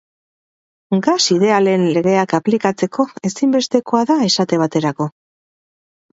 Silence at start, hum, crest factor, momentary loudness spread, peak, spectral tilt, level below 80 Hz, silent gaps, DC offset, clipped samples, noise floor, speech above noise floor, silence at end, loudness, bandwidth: 0.9 s; none; 16 dB; 7 LU; 0 dBFS; -5 dB/octave; -64 dBFS; none; under 0.1%; under 0.1%; under -90 dBFS; over 75 dB; 1.05 s; -16 LUFS; 8 kHz